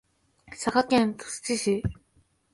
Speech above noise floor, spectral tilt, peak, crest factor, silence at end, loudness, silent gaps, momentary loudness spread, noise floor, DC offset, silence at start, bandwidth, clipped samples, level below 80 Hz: 40 dB; -4.5 dB/octave; -8 dBFS; 20 dB; 0.6 s; -27 LUFS; none; 12 LU; -66 dBFS; under 0.1%; 0.5 s; 11.5 kHz; under 0.1%; -50 dBFS